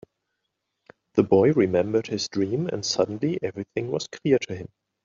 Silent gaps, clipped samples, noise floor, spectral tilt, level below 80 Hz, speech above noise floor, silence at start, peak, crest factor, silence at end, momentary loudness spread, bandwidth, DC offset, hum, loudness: none; under 0.1%; -79 dBFS; -5.5 dB/octave; -64 dBFS; 56 dB; 1.15 s; -4 dBFS; 20 dB; 0.4 s; 11 LU; 7.6 kHz; under 0.1%; none; -24 LUFS